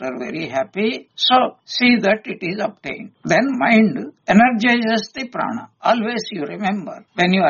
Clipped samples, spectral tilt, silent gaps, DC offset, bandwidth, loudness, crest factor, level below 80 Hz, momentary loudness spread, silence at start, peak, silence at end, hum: under 0.1%; -3 dB/octave; none; under 0.1%; 7.2 kHz; -18 LUFS; 16 dB; -58 dBFS; 13 LU; 0 s; -2 dBFS; 0 s; none